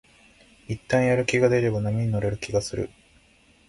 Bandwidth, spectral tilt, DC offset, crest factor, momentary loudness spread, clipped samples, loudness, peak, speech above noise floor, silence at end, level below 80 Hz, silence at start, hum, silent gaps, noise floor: 11.5 kHz; -6 dB/octave; under 0.1%; 18 dB; 14 LU; under 0.1%; -24 LUFS; -8 dBFS; 35 dB; 0.8 s; -48 dBFS; 0.7 s; none; none; -58 dBFS